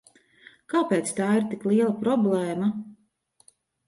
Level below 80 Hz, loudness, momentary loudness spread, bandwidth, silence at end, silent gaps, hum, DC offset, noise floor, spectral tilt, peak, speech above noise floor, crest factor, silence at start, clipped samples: -72 dBFS; -25 LUFS; 6 LU; 11.5 kHz; 0.95 s; none; none; under 0.1%; -65 dBFS; -6 dB/octave; -10 dBFS; 42 dB; 16 dB; 0.7 s; under 0.1%